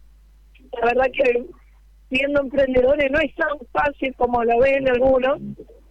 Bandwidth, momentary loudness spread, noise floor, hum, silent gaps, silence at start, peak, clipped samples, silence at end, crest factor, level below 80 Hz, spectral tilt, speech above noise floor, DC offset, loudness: 8.2 kHz; 9 LU; -50 dBFS; none; none; 0.75 s; -6 dBFS; under 0.1%; 0.25 s; 16 dB; -42 dBFS; -6.5 dB/octave; 31 dB; under 0.1%; -20 LUFS